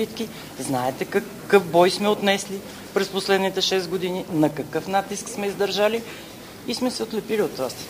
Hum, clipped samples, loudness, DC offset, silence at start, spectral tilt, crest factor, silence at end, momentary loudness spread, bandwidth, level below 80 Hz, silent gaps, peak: none; under 0.1%; -23 LUFS; under 0.1%; 0 s; -4 dB/octave; 22 dB; 0 s; 13 LU; 15.5 kHz; -58 dBFS; none; 0 dBFS